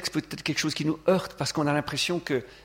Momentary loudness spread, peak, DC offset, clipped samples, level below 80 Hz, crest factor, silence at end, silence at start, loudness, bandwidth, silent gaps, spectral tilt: 5 LU; -10 dBFS; under 0.1%; under 0.1%; -58 dBFS; 18 dB; 0.05 s; 0 s; -27 LUFS; 16.5 kHz; none; -4.5 dB/octave